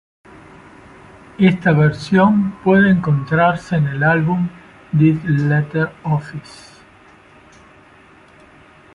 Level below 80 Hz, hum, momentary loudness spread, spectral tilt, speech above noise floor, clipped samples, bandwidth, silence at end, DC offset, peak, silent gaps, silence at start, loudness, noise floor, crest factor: -50 dBFS; none; 8 LU; -8.5 dB/octave; 31 dB; under 0.1%; 10.5 kHz; 2.55 s; under 0.1%; -2 dBFS; none; 1.4 s; -16 LUFS; -46 dBFS; 16 dB